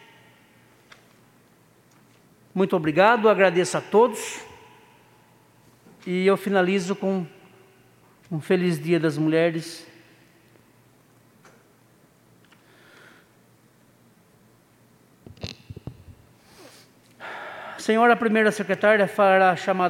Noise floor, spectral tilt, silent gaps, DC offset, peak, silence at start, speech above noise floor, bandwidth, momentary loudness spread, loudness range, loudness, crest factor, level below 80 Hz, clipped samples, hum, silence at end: -58 dBFS; -5.5 dB/octave; none; under 0.1%; -2 dBFS; 2.55 s; 37 dB; 16.5 kHz; 21 LU; 23 LU; -21 LUFS; 22 dB; -66 dBFS; under 0.1%; none; 0 s